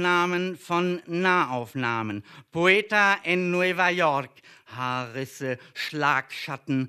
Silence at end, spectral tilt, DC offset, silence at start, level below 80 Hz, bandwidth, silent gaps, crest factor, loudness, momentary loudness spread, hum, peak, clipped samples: 0 s; -5 dB/octave; under 0.1%; 0 s; -72 dBFS; 14 kHz; none; 20 dB; -25 LUFS; 13 LU; none; -6 dBFS; under 0.1%